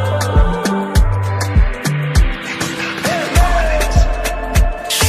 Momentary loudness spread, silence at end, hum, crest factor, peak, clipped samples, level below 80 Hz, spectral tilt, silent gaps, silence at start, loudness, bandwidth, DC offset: 5 LU; 0 s; none; 14 dB; 0 dBFS; under 0.1%; -16 dBFS; -4.5 dB/octave; none; 0 s; -16 LUFS; 15 kHz; under 0.1%